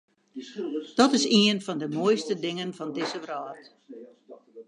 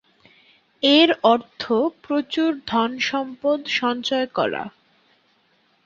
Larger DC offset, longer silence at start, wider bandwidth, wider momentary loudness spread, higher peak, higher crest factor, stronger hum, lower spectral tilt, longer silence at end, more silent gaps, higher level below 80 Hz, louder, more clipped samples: neither; second, 0.35 s vs 0.8 s; first, 11 kHz vs 7.4 kHz; first, 25 LU vs 9 LU; second, -6 dBFS vs -2 dBFS; about the same, 22 dB vs 20 dB; neither; about the same, -4 dB/octave vs -4 dB/octave; second, 0.05 s vs 1.15 s; neither; second, -74 dBFS vs -64 dBFS; second, -26 LUFS vs -21 LUFS; neither